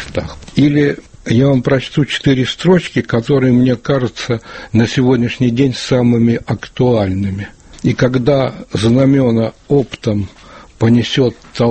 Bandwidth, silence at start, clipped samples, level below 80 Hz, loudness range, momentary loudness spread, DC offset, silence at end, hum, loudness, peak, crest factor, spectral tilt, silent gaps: 8.8 kHz; 0 s; under 0.1%; -40 dBFS; 1 LU; 9 LU; under 0.1%; 0 s; none; -14 LUFS; 0 dBFS; 14 dB; -7 dB/octave; none